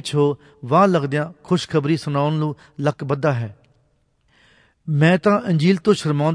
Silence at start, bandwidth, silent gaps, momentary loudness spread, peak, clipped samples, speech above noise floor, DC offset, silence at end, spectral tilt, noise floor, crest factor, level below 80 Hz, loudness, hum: 0.05 s; 10.5 kHz; none; 9 LU; -2 dBFS; under 0.1%; 44 dB; under 0.1%; 0 s; -7 dB/octave; -63 dBFS; 16 dB; -60 dBFS; -19 LUFS; none